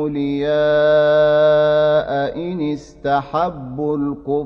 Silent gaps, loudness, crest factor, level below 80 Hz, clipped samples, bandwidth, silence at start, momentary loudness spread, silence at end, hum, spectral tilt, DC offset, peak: none; -17 LUFS; 12 dB; -46 dBFS; under 0.1%; 6.6 kHz; 0 s; 10 LU; 0 s; none; -7.5 dB/octave; under 0.1%; -4 dBFS